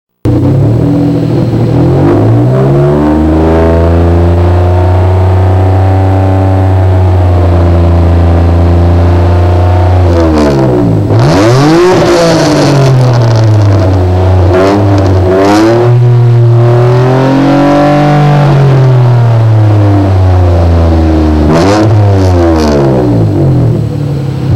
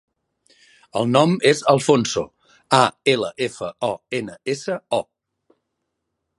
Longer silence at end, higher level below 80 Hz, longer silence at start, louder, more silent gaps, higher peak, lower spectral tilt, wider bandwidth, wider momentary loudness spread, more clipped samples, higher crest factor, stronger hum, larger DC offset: second, 0 s vs 1.35 s; first, -18 dBFS vs -60 dBFS; second, 0.25 s vs 0.95 s; first, -6 LUFS vs -20 LUFS; neither; about the same, 0 dBFS vs 0 dBFS; first, -8 dB/octave vs -4.5 dB/octave; about the same, 10.5 kHz vs 11.5 kHz; second, 2 LU vs 11 LU; neither; second, 4 dB vs 22 dB; neither; first, 1% vs under 0.1%